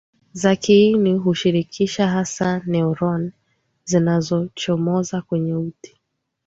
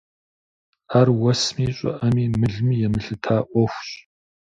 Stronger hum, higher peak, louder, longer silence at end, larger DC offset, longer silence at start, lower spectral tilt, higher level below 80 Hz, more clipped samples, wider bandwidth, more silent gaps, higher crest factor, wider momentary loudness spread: neither; about the same, -4 dBFS vs -4 dBFS; about the same, -19 LUFS vs -21 LUFS; about the same, 0.6 s vs 0.6 s; neither; second, 0.35 s vs 0.9 s; about the same, -6 dB/octave vs -6.5 dB/octave; second, -56 dBFS vs -46 dBFS; neither; about the same, 8 kHz vs 7.8 kHz; neither; about the same, 16 dB vs 18 dB; first, 11 LU vs 8 LU